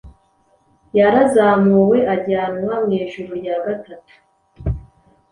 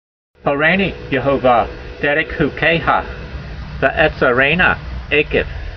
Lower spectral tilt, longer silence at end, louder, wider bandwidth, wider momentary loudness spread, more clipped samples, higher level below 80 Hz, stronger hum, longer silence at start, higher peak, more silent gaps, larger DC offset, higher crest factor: about the same, -7.5 dB/octave vs -7.5 dB/octave; first, 0.5 s vs 0 s; about the same, -17 LUFS vs -15 LUFS; first, 11 kHz vs 6.4 kHz; about the same, 14 LU vs 12 LU; neither; second, -38 dBFS vs -32 dBFS; neither; second, 0.05 s vs 0.45 s; about the same, -2 dBFS vs 0 dBFS; neither; neither; about the same, 16 dB vs 16 dB